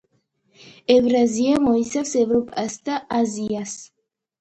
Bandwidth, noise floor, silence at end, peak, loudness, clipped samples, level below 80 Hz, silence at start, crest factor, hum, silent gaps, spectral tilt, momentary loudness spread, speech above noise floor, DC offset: 9 kHz; -67 dBFS; 0.55 s; -4 dBFS; -20 LUFS; under 0.1%; -56 dBFS; 0.9 s; 18 dB; none; none; -4.5 dB/octave; 11 LU; 47 dB; under 0.1%